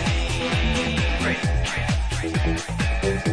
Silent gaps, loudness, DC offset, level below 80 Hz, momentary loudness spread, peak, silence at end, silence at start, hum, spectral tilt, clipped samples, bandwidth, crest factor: none; -23 LUFS; under 0.1%; -28 dBFS; 3 LU; -10 dBFS; 0 s; 0 s; none; -5 dB/octave; under 0.1%; 11 kHz; 12 dB